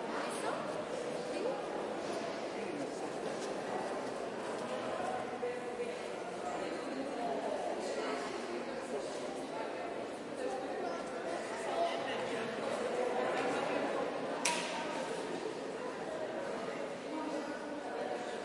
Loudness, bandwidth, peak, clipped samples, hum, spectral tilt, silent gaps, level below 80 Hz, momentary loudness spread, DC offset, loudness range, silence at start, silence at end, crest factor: -39 LUFS; 11.5 kHz; -14 dBFS; under 0.1%; none; -3.5 dB/octave; none; -74 dBFS; 6 LU; under 0.1%; 4 LU; 0 s; 0 s; 24 dB